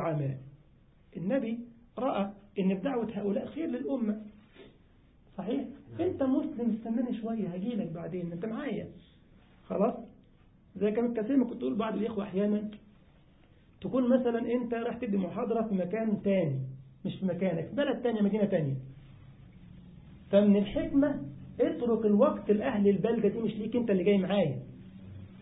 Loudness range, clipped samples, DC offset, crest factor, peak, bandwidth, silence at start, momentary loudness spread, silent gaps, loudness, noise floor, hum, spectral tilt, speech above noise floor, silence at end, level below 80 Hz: 7 LU; under 0.1%; under 0.1%; 20 dB; -12 dBFS; 4 kHz; 0 s; 14 LU; none; -31 LUFS; -61 dBFS; none; -11.5 dB/octave; 31 dB; 0 s; -60 dBFS